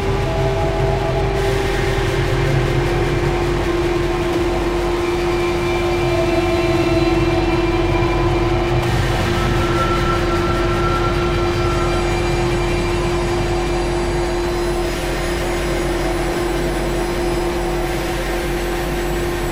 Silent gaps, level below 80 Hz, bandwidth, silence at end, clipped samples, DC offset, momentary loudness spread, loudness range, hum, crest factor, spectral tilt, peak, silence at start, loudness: none; -24 dBFS; 16 kHz; 0 s; under 0.1%; 0.4%; 4 LU; 3 LU; none; 12 dB; -6 dB/octave; -6 dBFS; 0 s; -18 LUFS